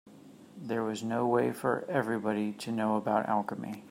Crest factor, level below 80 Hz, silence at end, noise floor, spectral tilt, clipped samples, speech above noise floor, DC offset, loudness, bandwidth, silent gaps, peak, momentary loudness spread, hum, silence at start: 18 dB; -78 dBFS; 0 s; -53 dBFS; -6.5 dB/octave; under 0.1%; 22 dB; under 0.1%; -31 LUFS; 16 kHz; none; -14 dBFS; 7 LU; none; 0.05 s